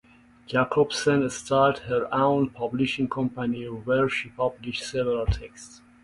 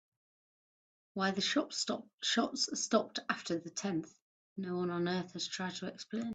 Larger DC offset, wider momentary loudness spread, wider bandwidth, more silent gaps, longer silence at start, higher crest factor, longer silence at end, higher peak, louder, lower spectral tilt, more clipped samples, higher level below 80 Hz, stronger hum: neither; about the same, 8 LU vs 9 LU; first, 11.5 kHz vs 9.4 kHz; second, none vs 2.14-2.18 s, 4.21-4.56 s; second, 0.5 s vs 1.15 s; about the same, 18 dB vs 22 dB; first, 0.25 s vs 0 s; first, -8 dBFS vs -14 dBFS; first, -25 LUFS vs -36 LUFS; first, -5.5 dB/octave vs -3.5 dB/octave; neither; first, -44 dBFS vs -80 dBFS; neither